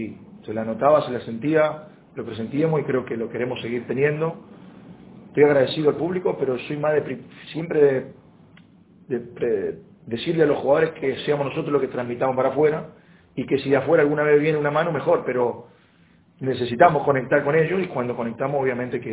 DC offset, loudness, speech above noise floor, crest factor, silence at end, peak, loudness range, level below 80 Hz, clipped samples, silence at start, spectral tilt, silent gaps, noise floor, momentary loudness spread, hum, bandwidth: under 0.1%; -22 LUFS; 34 dB; 22 dB; 0 s; 0 dBFS; 4 LU; -60 dBFS; under 0.1%; 0 s; -10.5 dB/octave; none; -56 dBFS; 14 LU; none; 4 kHz